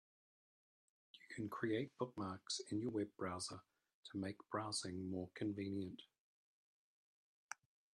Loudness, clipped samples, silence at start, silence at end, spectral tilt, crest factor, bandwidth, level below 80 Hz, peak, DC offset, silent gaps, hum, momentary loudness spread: -46 LUFS; under 0.1%; 1.15 s; 0.4 s; -4.5 dB/octave; 20 dB; 12.5 kHz; -84 dBFS; -28 dBFS; under 0.1%; 3.94-4.03 s, 6.20-7.49 s; none; 13 LU